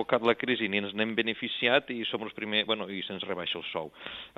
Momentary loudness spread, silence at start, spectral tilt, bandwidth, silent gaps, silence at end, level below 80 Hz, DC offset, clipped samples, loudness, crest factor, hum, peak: 10 LU; 0 s; -6.5 dB/octave; 7.8 kHz; none; 0.1 s; -70 dBFS; under 0.1%; under 0.1%; -29 LUFS; 22 dB; none; -8 dBFS